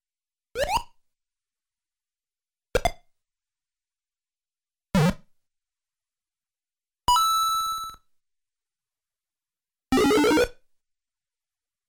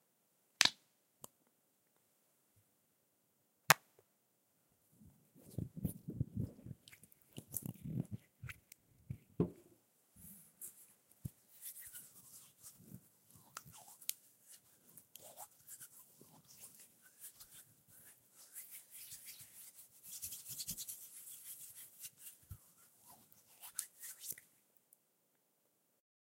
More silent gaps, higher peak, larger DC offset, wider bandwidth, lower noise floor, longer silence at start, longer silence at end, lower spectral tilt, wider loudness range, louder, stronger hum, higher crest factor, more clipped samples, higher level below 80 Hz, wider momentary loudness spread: neither; second, -10 dBFS vs -2 dBFS; neither; first, 19 kHz vs 16 kHz; first, under -90 dBFS vs -80 dBFS; about the same, 0.55 s vs 0.6 s; second, 1.35 s vs 1.95 s; first, -4.5 dB/octave vs -2.5 dB/octave; second, 10 LU vs 14 LU; first, -24 LUFS vs -43 LUFS; neither; second, 18 dB vs 44 dB; neither; first, -46 dBFS vs -70 dBFS; second, 11 LU vs 20 LU